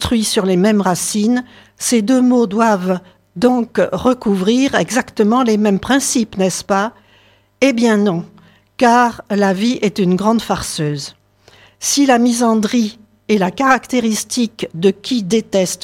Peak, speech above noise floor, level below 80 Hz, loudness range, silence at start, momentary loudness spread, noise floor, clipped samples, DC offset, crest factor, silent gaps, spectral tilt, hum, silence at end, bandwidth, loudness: 0 dBFS; 37 dB; -48 dBFS; 2 LU; 0 s; 8 LU; -51 dBFS; under 0.1%; under 0.1%; 16 dB; none; -4.5 dB/octave; none; 0.1 s; 16 kHz; -15 LUFS